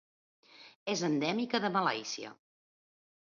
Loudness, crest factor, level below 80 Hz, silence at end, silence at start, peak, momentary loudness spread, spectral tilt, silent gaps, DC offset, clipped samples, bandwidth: -33 LUFS; 20 dB; -82 dBFS; 1 s; 0.55 s; -16 dBFS; 12 LU; -3 dB/octave; 0.76-0.86 s; under 0.1%; under 0.1%; 7.2 kHz